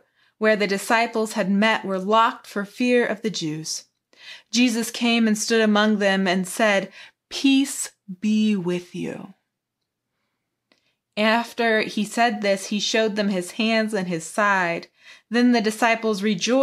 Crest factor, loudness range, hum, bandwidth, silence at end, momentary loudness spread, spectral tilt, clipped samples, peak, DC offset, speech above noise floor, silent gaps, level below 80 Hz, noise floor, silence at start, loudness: 18 dB; 5 LU; none; 14.5 kHz; 0 s; 11 LU; -4 dB/octave; under 0.1%; -4 dBFS; under 0.1%; 60 dB; none; -76 dBFS; -81 dBFS; 0.4 s; -21 LUFS